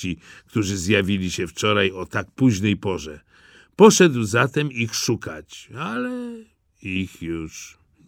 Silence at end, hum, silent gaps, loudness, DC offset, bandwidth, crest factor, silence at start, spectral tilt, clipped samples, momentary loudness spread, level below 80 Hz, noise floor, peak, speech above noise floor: 0.4 s; none; none; -21 LUFS; under 0.1%; 17 kHz; 22 dB; 0 s; -4.5 dB/octave; under 0.1%; 20 LU; -52 dBFS; -52 dBFS; 0 dBFS; 31 dB